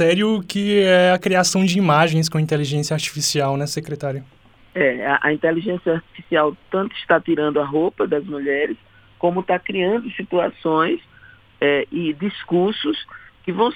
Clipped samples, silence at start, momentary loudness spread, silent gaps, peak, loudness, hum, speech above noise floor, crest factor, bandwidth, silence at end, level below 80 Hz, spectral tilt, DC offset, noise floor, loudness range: under 0.1%; 0 s; 10 LU; none; -2 dBFS; -20 LUFS; none; 29 dB; 16 dB; 18.5 kHz; 0 s; -58 dBFS; -5 dB/octave; under 0.1%; -48 dBFS; 4 LU